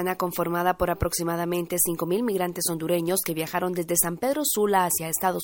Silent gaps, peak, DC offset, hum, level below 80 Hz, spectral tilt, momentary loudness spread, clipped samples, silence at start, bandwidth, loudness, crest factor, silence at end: none; -6 dBFS; under 0.1%; none; -48 dBFS; -4 dB/octave; 5 LU; under 0.1%; 0 s; 17 kHz; -25 LUFS; 20 dB; 0 s